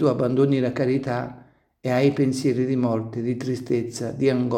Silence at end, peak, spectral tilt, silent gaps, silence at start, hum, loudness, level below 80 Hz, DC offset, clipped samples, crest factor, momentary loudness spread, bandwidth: 0 s; -6 dBFS; -7 dB/octave; none; 0 s; none; -23 LUFS; -60 dBFS; under 0.1%; under 0.1%; 16 dB; 8 LU; 13 kHz